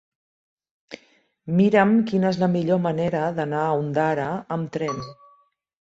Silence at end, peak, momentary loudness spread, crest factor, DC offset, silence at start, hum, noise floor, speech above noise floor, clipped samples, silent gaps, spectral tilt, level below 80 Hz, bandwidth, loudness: 0.8 s; -4 dBFS; 23 LU; 20 dB; under 0.1%; 0.9 s; none; -60 dBFS; 39 dB; under 0.1%; none; -8 dB/octave; -62 dBFS; 7.8 kHz; -22 LUFS